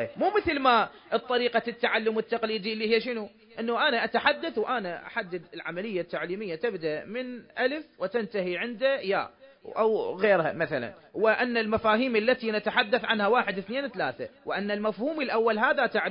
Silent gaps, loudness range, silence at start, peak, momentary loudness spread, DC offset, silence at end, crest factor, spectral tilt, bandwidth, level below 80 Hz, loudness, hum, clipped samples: none; 6 LU; 0 s; -6 dBFS; 10 LU; under 0.1%; 0 s; 20 dB; -9 dB/octave; 5.4 kHz; -62 dBFS; -27 LUFS; none; under 0.1%